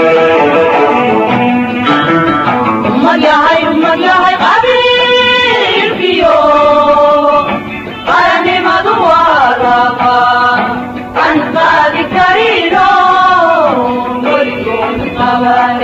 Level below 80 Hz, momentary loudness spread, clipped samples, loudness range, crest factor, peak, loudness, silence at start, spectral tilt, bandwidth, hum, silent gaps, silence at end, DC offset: -40 dBFS; 6 LU; 0.1%; 2 LU; 8 dB; 0 dBFS; -8 LUFS; 0 s; -5.5 dB/octave; 13.5 kHz; none; none; 0 s; under 0.1%